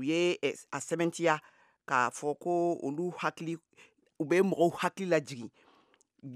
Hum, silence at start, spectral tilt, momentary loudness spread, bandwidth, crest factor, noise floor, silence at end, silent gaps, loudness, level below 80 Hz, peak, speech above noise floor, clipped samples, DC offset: none; 0 s; -5 dB/octave; 12 LU; 14 kHz; 22 dB; -67 dBFS; 0 s; none; -31 LUFS; -84 dBFS; -10 dBFS; 36 dB; under 0.1%; under 0.1%